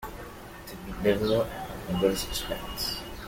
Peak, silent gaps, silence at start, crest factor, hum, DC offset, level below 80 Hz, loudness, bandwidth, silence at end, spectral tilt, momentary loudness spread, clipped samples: -10 dBFS; none; 0 s; 20 dB; none; under 0.1%; -44 dBFS; -29 LUFS; 17 kHz; 0 s; -4.5 dB/octave; 16 LU; under 0.1%